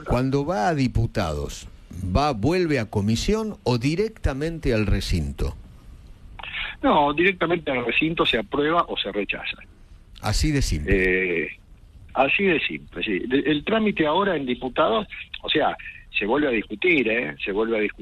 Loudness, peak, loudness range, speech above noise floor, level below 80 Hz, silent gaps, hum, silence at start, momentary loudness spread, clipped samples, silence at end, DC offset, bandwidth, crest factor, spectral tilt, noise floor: -23 LUFS; -6 dBFS; 3 LU; 24 dB; -36 dBFS; none; none; 0 s; 10 LU; under 0.1%; 0 s; under 0.1%; 13.5 kHz; 18 dB; -5.5 dB/octave; -47 dBFS